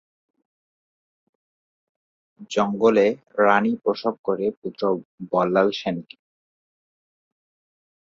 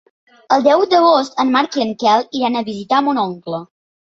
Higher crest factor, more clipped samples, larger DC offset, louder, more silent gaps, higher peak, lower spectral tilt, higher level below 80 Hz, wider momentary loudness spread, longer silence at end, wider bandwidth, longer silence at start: first, 22 dB vs 14 dB; neither; neither; second, -22 LUFS vs -15 LUFS; first, 4.19-4.24 s, 4.57-4.62 s, 5.05-5.18 s vs none; about the same, -2 dBFS vs -2 dBFS; first, -6 dB/octave vs -4.5 dB/octave; about the same, -68 dBFS vs -64 dBFS; about the same, 10 LU vs 10 LU; first, 2.2 s vs 0.5 s; about the same, 7.8 kHz vs 7.8 kHz; first, 2.4 s vs 0.5 s